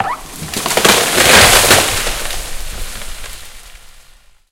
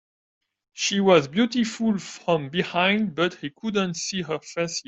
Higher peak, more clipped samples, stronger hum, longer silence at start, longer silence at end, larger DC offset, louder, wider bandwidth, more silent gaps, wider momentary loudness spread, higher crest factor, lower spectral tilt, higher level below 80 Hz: first, 0 dBFS vs -4 dBFS; first, 0.4% vs under 0.1%; neither; second, 0 s vs 0.75 s; first, 0.5 s vs 0.05 s; neither; first, -9 LUFS vs -24 LUFS; first, over 20 kHz vs 8.4 kHz; neither; first, 22 LU vs 9 LU; second, 14 dB vs 20 dB; second, -1.5 dB/octave vs -4.5 dB/octave; first, -28 dBFS vs -64 dBFS